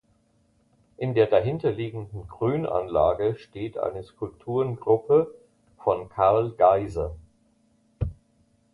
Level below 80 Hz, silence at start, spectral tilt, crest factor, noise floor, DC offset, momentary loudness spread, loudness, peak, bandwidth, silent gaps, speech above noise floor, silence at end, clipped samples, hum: -46 dBFS; 1 s; -9 dB/octave; 20 dB; -65 dBFS; under 0.1%; 14 LU; -25 LUFS; -6 dBFS; 7 kHz; none; 41 dB; 0.6 s; under 0.1%; none